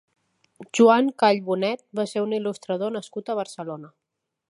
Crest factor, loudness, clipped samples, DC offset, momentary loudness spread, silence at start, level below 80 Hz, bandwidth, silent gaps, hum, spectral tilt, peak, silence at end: 20 dB; -23 LUFS; under 0.1%; under 0.1%; 16 LU; 0.6 s; -78 dBFS; 11.5 kHz; none; none; -5 dB/octave; -4 dBFS; 0.65 s